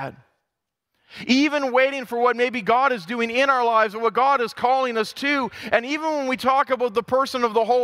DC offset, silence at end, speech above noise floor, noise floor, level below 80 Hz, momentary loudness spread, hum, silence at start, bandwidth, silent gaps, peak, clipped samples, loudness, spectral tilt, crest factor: under 0.1%; 0 s; 61 dB; -82 dBFS; -66 dBFS; 5 LU; none; 0 s; 15.5 kHz; none; -2 dBFS; under 0.1%; -21 LUFS; -4 dB/octave; 18 dB